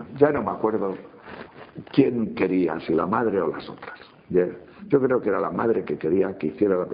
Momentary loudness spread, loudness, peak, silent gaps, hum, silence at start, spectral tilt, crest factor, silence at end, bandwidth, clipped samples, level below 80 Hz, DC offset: 20 LU; -23 LUFS; -4 dBFS; none; none; 0 s; -6.5 dB/octave; 20 dB; 0 s; 5 kHz; under 0.1%; -58 dBFS; under 0.1%